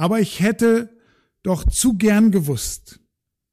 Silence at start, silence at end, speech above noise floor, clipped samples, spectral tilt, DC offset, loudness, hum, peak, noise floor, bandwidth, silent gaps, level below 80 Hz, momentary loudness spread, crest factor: 0 s; 0.75 s; 56 dB; under 0.1%; -5 dB/octave; under 0.1%; -18 LUFS; none; -8 dBFS; -73 dBFS; 15.5 kHz; none; -32 dBFS; 13 LU; 12 dB